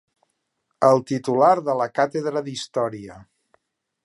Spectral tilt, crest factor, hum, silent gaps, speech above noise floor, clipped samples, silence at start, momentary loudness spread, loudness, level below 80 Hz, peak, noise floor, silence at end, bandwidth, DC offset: -5.5 dB/octave; 20 dB; none; none; 55 dB; under 0.1%; 0.8 s; 11 LU; -21 LUFS; -66 dBFS; -4 dBFS; -75 dBFS; 0.8 s; 11.5 kHz; under 0.1%